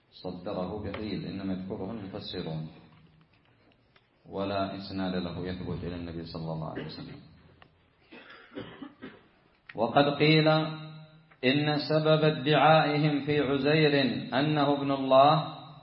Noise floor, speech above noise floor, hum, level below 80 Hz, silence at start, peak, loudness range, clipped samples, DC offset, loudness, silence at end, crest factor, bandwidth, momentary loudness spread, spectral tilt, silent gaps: -65 dBFS; 38 dB; none; -60 dBFS; 0.15 s; -8 dBFS; 15 LU; under 0.1%; under 0.1%; -27 LUFS; 0 s; 22 dB; 5.8 kHz; 21 LU; -10.5 dB/octave; none